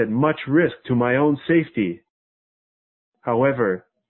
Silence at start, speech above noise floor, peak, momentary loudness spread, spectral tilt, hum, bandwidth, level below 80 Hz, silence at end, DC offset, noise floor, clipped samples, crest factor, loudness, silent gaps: 0 s; over 70 dB; -6 dBFS; 7 LU; -12 dB/octave; none; 4.2 kHz; -58 dBFS; 0.3 s; under 0.1%; under -90 dBFS; under 0.1%; 16 dB; -21 LUFS; 2.10-3.12 s